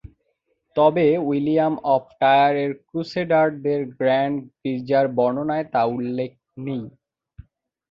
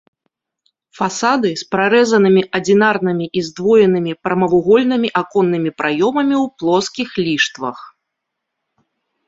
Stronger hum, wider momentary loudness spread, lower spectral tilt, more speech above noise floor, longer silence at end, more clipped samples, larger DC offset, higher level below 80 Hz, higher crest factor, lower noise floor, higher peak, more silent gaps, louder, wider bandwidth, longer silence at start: neither; first, 13 LU vs 8 LU; first, -8.5 dB/octave vs -5 dB/octave; second, 51 dB vs 62 dB; second, 1 s vs 1.4 s; neither; neither; about the same, -58 dBFS vs -58 dBFS; about the same, 16 dB vs 14 dB; second, -71 dBFS vs -77 dBFS; about the same, -4 dBFS vs -2 dBFS; neither; second, -21 LUFS vs -15 LUFS; second, 7 kHz vs 8 kHz; second, 0.75 s vs 1 s